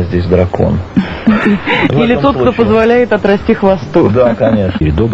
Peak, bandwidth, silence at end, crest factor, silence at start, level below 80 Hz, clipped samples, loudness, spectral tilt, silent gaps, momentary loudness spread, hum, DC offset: 0 dBFS; 7.8 kHz; 0 s; 10 dB; 0 s; -28 dBFS; 0.2%; -11 LUFS; -8.5 dB/octave; none; 4 LU; none; 0.9%